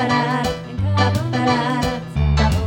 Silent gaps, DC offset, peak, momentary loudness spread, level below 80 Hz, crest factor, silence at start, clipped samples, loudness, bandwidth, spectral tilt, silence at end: none; under 0.1%; -2 dBFS; 5 LU; -26 dBFS; 16 dB; 0 s; under 0.1%; -19 LUFS; 17 kHz; -6 dB/octave; 0 s